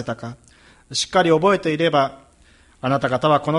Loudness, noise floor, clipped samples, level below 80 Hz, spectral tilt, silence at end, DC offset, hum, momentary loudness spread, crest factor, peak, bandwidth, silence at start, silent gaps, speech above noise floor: -19 LUFS; -53 dBFS; under 0.1%; -54 dBFS; -5 dB/octave; 0 s; under 0.1%; none; 13 LU; 18 dB; -4 dBFS; 11.5 kHz; 0 s; none; 34 dB